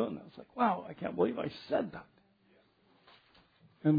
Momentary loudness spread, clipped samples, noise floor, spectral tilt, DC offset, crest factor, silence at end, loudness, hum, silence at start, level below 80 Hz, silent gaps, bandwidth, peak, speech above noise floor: 15 LU; under 0.1%; -68 dBFS; -6.5 dB/octave; under 0.1%; 18 dB; 0 s; -35 LUFS; none; 0 s; -72 dBFS; none; 5 kHz; -16 dBFS; 35 dB